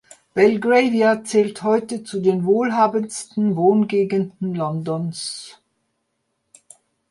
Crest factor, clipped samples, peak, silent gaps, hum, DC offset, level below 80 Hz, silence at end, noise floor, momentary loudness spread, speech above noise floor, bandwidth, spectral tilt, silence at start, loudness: 18 dB; under 0.1%; -2 dBFS; none; none; under 0.1%; -66 dBFS; 1.6 s; -73 dBFS; 10 LU; 54 dB; 11.5 kHz; -6 dB/octave; 0.35 s; -19 LUFS